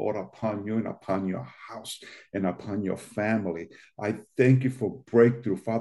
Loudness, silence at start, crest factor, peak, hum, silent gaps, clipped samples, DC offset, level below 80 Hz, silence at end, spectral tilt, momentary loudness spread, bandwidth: -27 LUFS; 0 s; 20 dB; -6 dBFS; none; none; under 0.1%; under 0.1%; -68 dBFS; 0 s; -7.5 dB/octave; 16 LU; 12 kHz